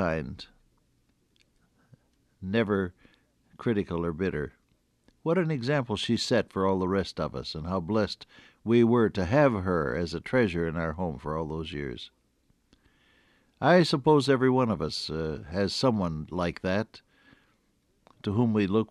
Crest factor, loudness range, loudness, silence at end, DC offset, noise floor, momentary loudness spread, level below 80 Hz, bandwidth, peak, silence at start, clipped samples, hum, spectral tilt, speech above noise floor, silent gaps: 20 dB; 7 LU; -27 LUFS; 0.05 s; under 0.1%; -70 dBFS; 13 LU; -52 dBFS; 12 kHz; -8 dBFS; 0 s; under 0.1%; none; -6.5 dB/octave; 43 dB; none